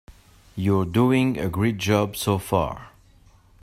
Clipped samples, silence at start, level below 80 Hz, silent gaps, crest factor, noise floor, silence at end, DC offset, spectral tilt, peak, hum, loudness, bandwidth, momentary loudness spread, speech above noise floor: under 0.1%; 0.1 s; -48 dBFS; none; 18 dB; -54 dBFS; 0.75 s; under 0.1%; -6 dB/octave; -6 dBFS; none; -23 LUFS; 16 kHz; 9 LU; 32 dB